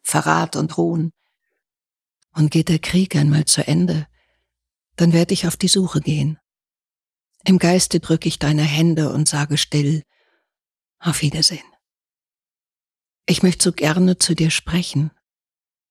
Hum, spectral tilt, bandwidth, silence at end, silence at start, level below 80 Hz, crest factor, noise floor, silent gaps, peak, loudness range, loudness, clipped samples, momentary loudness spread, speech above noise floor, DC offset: none; -4.5 dB/octave; 14.5 kHz; 0.8 s; 0.05 s; -48 dBFS; 18 dB; under -90 dBFS; none; -2 dBFS; 4 LU; -18 LUFS; under 0.1%; 9 LU; over 73 dB; under 0.1%